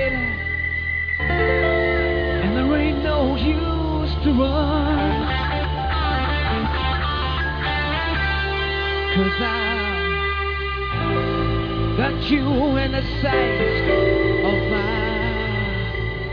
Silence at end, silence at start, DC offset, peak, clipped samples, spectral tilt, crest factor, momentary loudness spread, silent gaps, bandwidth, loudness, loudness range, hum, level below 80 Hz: 0 s; 0 s; under 0.1%; -6 dBFS; under 0.1%; -8 dB/octave; 14 dB; 4 LU; none; 5.4 kHz; -21 LUFS; 2 LU; none; -28 dBFS